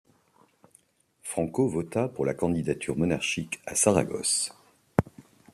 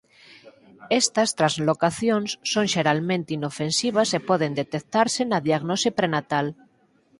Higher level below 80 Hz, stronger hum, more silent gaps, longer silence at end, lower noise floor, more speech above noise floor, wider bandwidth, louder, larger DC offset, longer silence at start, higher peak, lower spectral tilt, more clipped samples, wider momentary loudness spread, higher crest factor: first, -56 dBFS vs -64 dBFS; neither; neither; second, 0.35 s vs 0.65 s; about the same, -64 dBFS vs -61 dBFS; about the same, 37 dB vs 38 dB; first, 14 kHz vs 11.5 kHz; second, -27 LUFS vs -23 LUFS; neither; first, 1.25 s vs 0.3 s; about the same, -4 dBFS vs -4 dBFS; about the same, -4 dB/octave vs -4 dB/octave; neither; first, 9 LU vs 5 LU; first, 26 dB vs 20 dB